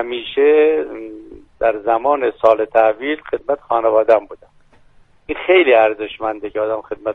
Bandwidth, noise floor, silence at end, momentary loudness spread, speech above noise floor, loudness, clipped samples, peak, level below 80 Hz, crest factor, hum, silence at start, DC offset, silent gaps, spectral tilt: 4.3 kHz; -49 dBFS; 0 s; 11 LU; 33 dB; -16 LUFS; under 0.1%; 0 dBFS; -50 dBFS; 16 dB; none; 0 s; under 0.1%; none; -6 dB/octave